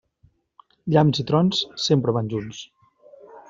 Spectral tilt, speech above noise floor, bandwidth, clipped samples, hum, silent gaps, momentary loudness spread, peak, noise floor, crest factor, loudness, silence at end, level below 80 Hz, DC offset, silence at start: -6 dB/octave; 40 dB; 7.6 kHz; under 0.1%; none; none; 18 LU; -4 dBFS; -61 dBFS; 20 dB; -21 LUFS; 0.1 s; -58 dBFS; under 0.1%; 0.85 s